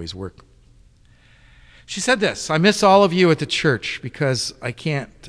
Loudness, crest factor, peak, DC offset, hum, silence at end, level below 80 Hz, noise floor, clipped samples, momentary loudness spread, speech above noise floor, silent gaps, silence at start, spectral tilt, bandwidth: -18 LUFS; 18 dB; -2 dBFS; under 0.1%; none; 0 s; -52 dBFS; -52 dBFS; under 0.1%; 16 LU; 33 dB; none; 0 s; -4.5 dB/octave; 11 kHz